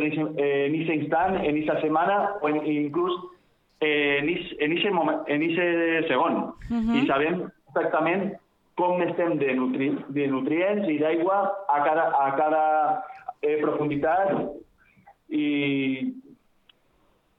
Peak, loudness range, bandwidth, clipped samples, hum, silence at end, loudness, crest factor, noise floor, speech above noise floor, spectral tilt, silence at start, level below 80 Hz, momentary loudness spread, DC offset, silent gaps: -10 dBFS; 3 LU; 4.6 kHz; under 0.1%; none; 1.05 s; -25 LUFS; 16 dB; -64 dBFS; 40 dB; -8 dB/octave; 0 s; -58 dBFS; 7 LU; under 0.1%; none